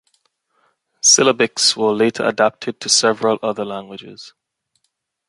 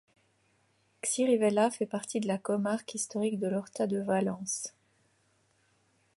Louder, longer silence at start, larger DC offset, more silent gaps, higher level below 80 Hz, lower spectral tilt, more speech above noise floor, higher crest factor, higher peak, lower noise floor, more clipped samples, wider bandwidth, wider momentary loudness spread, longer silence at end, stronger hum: first, -15 LUFS vs -31 LUFS; about the same, 1.05 s vs 1.05 s; neither; neither; first, -66 dBFS vs -76 dBFS; second, -1.5 dB/octave vs -4.5 dB/octave; first, 54 dB vs 40 dB; about the same, 18 dB vs 18 dB; first, 0 dBFS vs -14 dBFS; about the same, -72 dBFS vs -71 dBFS; neither; about the same, 11.5 kHz vs 11.5 kHz; first, 18 LU vs 9 LU; second, 1 s vs 1.5 s; neither